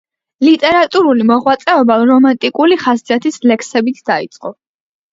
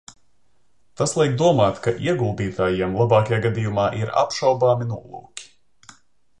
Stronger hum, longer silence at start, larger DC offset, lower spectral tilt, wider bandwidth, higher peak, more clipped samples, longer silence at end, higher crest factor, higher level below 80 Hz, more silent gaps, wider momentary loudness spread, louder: neither; second, 0.4 s vs 1 s; second, under 0.1% vs 0.2%; second, -4.5 dB/octave vs -6 dB/octave; second, 7.8 kHz vs 11 kHz; about the same, 0 dBFS vs -2 dBFS; neither; second, 0.6 s vs 0.95 s; second, 12 dB vs 18 dB; second, -58 dBFS vs -50 dBFS; neither; second, 8 LU vs 14 LU; first, -12 LUFS vs -20 LUFS